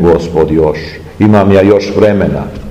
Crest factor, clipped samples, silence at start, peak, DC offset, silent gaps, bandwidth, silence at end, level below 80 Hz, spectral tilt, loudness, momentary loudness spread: 8 dB; 4%; 0 s; 0 dBFS; 1%; none; 9.8 kHz; 0 s; -30 dBFS; -8 dB/octave; -9 LUFS; 11 LU